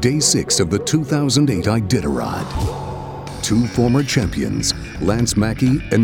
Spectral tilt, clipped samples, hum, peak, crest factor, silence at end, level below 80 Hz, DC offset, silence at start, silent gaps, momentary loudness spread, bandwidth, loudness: -4.5 dB/octave; under 0.1%; none; -2 dBFS; 16 dB; 0 s; -34 dBFS; under 0.1%; 0 s; none; 8 LU; 17.5 kHz; -18 LUFS